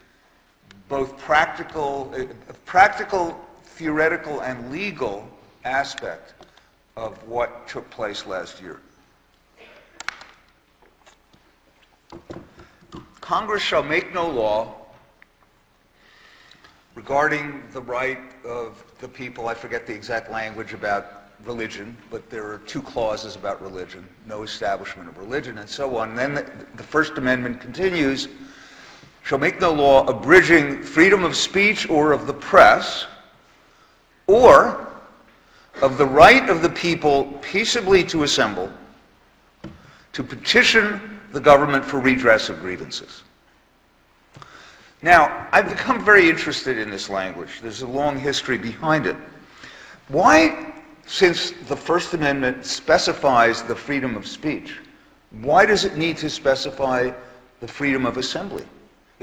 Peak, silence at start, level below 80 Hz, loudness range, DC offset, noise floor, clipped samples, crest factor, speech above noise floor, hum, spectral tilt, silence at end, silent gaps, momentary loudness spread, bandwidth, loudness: 0 dBFS; 0.9 s; -50 dBFS; 13 LU; under 0.1%; -59 dBFS; under 0.1%; 22 dB; 40 dB; none; -4 dB/octave; 0.6 s; none; 21 LU; 18.5 kHz; -19 LUFS